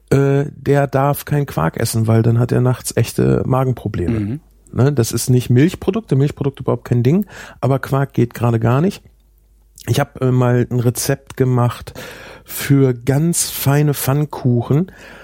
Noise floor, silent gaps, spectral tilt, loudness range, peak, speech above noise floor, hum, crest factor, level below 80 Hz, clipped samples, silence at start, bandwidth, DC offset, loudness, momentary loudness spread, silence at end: -51 dBFS; none; -6.5 dB/octave; 2 LU; -2 dBFS; 35 dB; none; 14 dB; -42 dBFS; under 0.1%; 0.1 s; 17 kHz; under 0.1%; -17 LUFS; 8 LU; 0 s